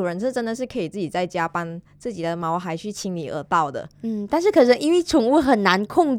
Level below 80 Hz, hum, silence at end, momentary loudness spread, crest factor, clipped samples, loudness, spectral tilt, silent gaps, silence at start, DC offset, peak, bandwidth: -54 dBFS; none; 0 s; 13 LU; 18 dB; under 0.1%; -21 LUFS; -5.5 dB/octave; none; 0 s; under 0.1%; -2 dBFS; 16 kHz